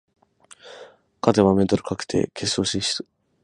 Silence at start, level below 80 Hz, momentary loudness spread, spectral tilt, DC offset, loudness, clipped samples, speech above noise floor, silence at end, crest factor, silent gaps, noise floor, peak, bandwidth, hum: 0.65 s; -50 dBFS; 24 LU; -5 dB/octave; under 0.1%; -22 LUFS; under 0.1%; 30 dB; 0.4 s; 24 dB; none; -52 dBFS; 0 dBFS; 11.5 kHz; none